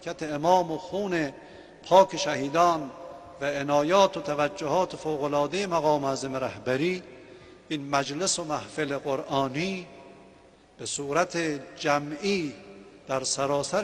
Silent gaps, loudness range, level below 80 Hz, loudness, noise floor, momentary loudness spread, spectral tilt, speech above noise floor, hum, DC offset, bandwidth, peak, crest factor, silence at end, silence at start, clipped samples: none; 5 LU; -62 dBFS; -27 LUFS; -55 dBFS; 13 LU; -4 dB/octave; 28 dB; none; under 0.1%; 12 kHz; -6 dBFS; 22 dB; 0 s; 0 s; under 0.1%